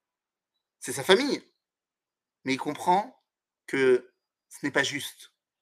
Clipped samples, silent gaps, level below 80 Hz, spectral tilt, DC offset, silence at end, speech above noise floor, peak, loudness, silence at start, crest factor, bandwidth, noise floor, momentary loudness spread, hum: under 0.1%; none; -80 dBFS; -3.5 dB/octave; under 0.1%; 0.35 s; over 64 dB; -4 dBFS; -27 LUFS; 0.8 s; 26 dB; 15 kHz; under -90 dBFS; 15 LU; none